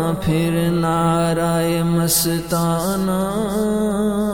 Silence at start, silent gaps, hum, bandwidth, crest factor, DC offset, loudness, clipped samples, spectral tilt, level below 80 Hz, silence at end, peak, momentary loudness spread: 0 s; none; none; over 20 kHz; 14 dB; under 0.1%; -18 LUFS; under 0.1%; -5.5 dB/octave; -40 dBFS; 0 s; -4 dBFS; 4 LU